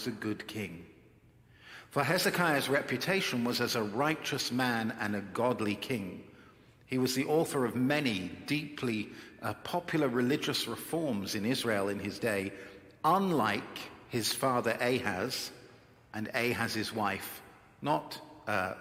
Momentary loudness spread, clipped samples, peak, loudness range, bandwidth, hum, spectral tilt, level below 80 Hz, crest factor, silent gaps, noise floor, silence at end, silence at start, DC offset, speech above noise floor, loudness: 12 LU; under 0.1%; -12 dBFS; 3 LU; 16.5 kHz; none; -4.5 dB/octave; -70 dBFS; 20 dB; none; -61 dBFS; 0 s; 0 s; under 0.1%; 29 dB; -32 LUFS